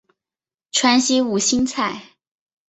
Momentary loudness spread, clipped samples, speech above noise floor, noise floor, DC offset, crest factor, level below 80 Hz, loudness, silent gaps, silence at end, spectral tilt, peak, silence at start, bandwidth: 9 LU; under 0.1%; over 72 dB; under -90 dBFS; under 0.1%; 18 dB; -56 dBFS; -18 LUFS; none; 0.65 s; -2 dB/octave; -2 dBFS; 0.75 s; 8.4 kHz